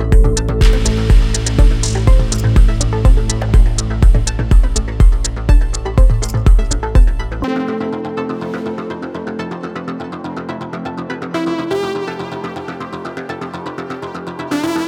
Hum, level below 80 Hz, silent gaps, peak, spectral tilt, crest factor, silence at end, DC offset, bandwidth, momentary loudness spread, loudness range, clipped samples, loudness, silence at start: none; -14 dBFS; none; 0 dBFS; -5.5 dB/octave; 12 dB; 0 s; under 0.1%; 11 kHz; 12 LU; 9 LU; under 0.1%; -17 LUFS; 0 s